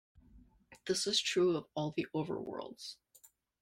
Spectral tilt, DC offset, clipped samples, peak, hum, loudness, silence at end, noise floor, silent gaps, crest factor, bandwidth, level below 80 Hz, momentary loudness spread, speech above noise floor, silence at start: -3.5 dB/octave; under 0.1%; under 0.1%; -18 dBFS; none; -35 LUFS; 0.65 s; -66 dBFS; none; 18 dB; 16 kHz; -70 dBFS; 17 LU; 30 dB; 0.15 s